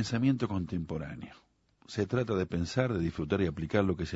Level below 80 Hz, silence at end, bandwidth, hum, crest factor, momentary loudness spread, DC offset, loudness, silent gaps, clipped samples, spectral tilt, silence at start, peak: -52 dBFS; 0 s; 8 kHz; none; 20 dB; 11 LU; under 0.1%; -32 LUFS; none; under 0.1%; -7 dB/octave; 0 s; -12 dBFS